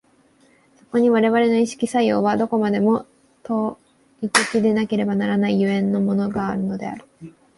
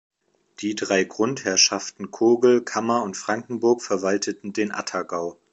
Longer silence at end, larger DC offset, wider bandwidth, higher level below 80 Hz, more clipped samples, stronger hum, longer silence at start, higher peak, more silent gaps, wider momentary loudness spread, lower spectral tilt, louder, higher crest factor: about the same, 0.25 s vs 0.2 s; neither; first, 11.5 kHz vs 8.2 kHz; first, -58 dBFS vs -68 dBFS; neither; neither; first, 0.95 s vs 0.6 s; about the same, -2 dBFS vs -2 dBFS; neither; about the same, 10 LU vs 12 LU; first, -5.5 dB/octave vs -3 dB/octave; about the same, -20 LUFS vs -22 LUFS; about the same, 18 dB vs 20 dB